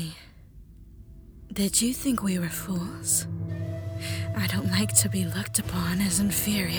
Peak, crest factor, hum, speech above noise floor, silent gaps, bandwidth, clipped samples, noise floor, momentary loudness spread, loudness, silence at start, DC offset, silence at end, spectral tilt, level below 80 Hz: -6 dBFS; 22 dB; none; 22 dB; none; over 20 kHz; under 0.1%; -49 dBFS; 12 LU; -26 LUFS; 0 s; under 0.1%; 0 s; -3.5 dB/octave; -48 dBFS